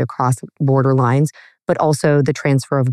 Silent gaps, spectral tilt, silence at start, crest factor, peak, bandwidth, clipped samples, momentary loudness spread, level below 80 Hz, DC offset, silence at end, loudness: none; -7 dB/octave; 0 s; 12 dB; -4 dBFS; 13 kHz; under 0.1%; 6 LU; -60 dBFS; under 0.1%; 0 s; -17 LUFS